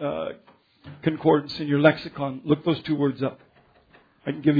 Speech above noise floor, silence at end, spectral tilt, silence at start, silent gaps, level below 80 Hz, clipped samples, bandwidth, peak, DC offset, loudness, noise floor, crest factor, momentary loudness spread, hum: 34 dB; 0 s; -9 dB/octave; 0 s; none; -62 dBFS; under 0.1%; 5 kHz; -2 dBFS; under 0.1%; -24 LUFS; -57 dBFS; 22 dB; 12 LU; none